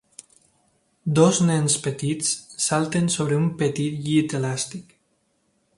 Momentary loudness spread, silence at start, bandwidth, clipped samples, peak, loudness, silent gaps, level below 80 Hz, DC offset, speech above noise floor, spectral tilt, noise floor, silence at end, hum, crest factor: 9 LU; 1.05 s; 11.5 kHz; under 0.1%; -2 dBFS; -22 LUFS; none; -60 dBFS; under 0.1%; 47 dB; -5 dB/octave; -68 dBFS; 0.95 s; none; 22 dB